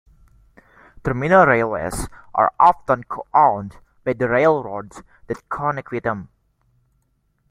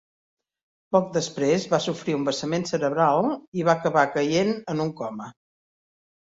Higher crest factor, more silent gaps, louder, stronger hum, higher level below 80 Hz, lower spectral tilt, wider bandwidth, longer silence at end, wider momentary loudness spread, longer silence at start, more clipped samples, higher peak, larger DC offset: about the same, 20 dB vs 20 dB; second, none vs 3.47-3.52 s; first, -19 LUFS vs -24 LUFS; neither; first, -46 dBFS vs -66 dBFS; first, -6.5 dB/octave vs -5 dB/octave; first, 15.5 kHz vs 8 kHz; first, 1.25 s vs 1 s; first, 17 LU vs 8 LU; first, 1.05 s vs 0.9 s; neither; about the same, -2 dBFS vs -4 dBFS; neither